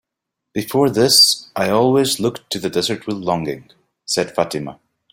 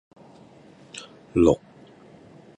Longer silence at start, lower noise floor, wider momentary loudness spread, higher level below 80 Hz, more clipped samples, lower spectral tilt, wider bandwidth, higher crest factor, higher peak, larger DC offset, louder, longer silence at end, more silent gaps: second, 0.55 s vs 0.95 s; first, -81 dBFS vs -50 dBFS; second, 17 LU vs 21 LU; second, -56 dBFS vs -48 dBFS; neither; second, -3.5 dB/octave vs -7 dB/octave; first, 16.5 kHz vs 10 kHz; second, 18 dB vs 24 dB; first, 0 dBFS vs -4 dBFS; neither; first, -16 LUFS vs -22 LUFS; second, 0.4 s vs 1 s; neither